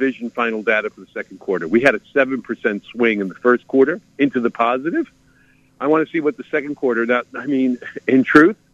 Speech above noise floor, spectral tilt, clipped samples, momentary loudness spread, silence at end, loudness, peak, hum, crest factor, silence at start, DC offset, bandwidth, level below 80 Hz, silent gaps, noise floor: 36 dB; -6.5 dB/octave; under 0.1%; 9 LU; 0.2 s; -18 LUFS; 0 dBFS; none; 18 dB; 0 s; under 0.1%; 9 kHz; -58 dBFS; none; -54 dBFS